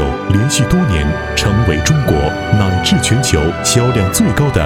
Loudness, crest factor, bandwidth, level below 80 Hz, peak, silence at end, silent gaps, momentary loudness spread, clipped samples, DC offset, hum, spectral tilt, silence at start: -13 LUFS; 12 dB; 17 kHz; -24 dBFS; 0 dBFS; 0 s; none; 3 LU; under 0.1%; under 0.1%; none; -5 dB/octave; 0 s